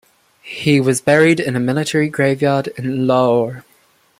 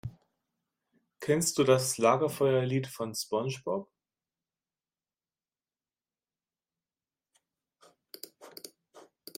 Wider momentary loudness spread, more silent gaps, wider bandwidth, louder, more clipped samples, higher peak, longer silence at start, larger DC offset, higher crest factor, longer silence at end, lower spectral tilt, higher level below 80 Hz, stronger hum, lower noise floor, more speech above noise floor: second, 10 LU vs 22 LU; neither; about the same, 15.5 kHz vs 16 kHz; first, -16 LUFS vs -29 LUFS; neither; first, 0 dBFS vs -10 dBFS; first, 0.45 s vs 0.05 s; neither; second, 16 dB vs 24 dB; first, 0.6 s vs 0.4 s; about the same, -5.5 dB/octave vs -4.5 dB/octave; first, -56 dBFS vs -70 dBFS; neither; second, -55 dBFS vs under -90 dBFS; second, 40 dB vs over 62 dB